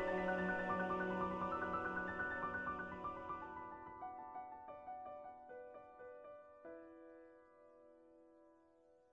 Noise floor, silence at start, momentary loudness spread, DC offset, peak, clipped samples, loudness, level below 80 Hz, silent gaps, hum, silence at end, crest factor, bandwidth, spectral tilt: -71 dBFS; 0 s; 20 LU; under 0.1%; -28 dBFS; under 0.1%; -44 LUFS; -70 dBFS; none; none; 0.15 s; 18 dB; 8.2 kHz; -7.5 dB/octave